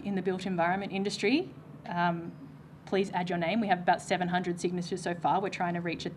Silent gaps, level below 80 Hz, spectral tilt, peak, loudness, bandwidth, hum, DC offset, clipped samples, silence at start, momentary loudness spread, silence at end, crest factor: none; -66 dBFS; -5.5 dB/octave; -12 dBFS; -31 LUFS; 11.5 kHz; none; under 0.1%; under 0.1%; 0 s; 11 LU; 0 s; 18 dB